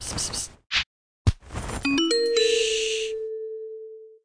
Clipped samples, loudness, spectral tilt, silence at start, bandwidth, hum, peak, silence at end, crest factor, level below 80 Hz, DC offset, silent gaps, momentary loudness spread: under 0.1%; -25 LUFS; -3.5 dB/octave; 0 s; 10.5 kHz; none; -8 dBFS; 0.1 s; 18 dB; -40 dBFS; under 0.1%; 0.86-1.25 s; 15 LU